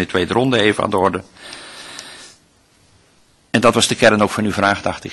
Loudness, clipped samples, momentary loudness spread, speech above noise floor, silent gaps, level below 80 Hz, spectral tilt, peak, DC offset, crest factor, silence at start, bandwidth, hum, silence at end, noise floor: -16 LUFS; under 0.1%; 20 LU; 38 dB; none; -50 dBFS; -4 dB/octave; 0 dBFS; under 0.1%; 18 dB; 0 s; 12.5 kHz; none; 0 s; -54 dBFS